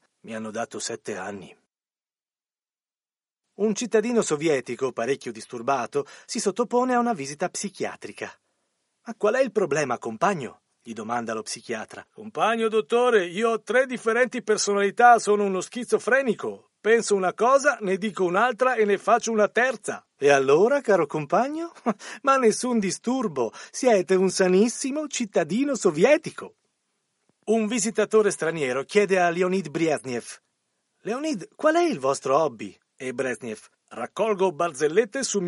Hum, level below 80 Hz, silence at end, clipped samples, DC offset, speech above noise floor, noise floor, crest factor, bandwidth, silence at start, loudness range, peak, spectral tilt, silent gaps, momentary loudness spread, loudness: none; -76 dBFS; 0 s; under 0.1%; under 0.1%; over 67 dB; under -90 dBFS; 20 dB; 11.5 kHz; 0.25 s; 6 LU; -4 dBFS; -4 dB/octave; none; 14 LU; -24 LUFS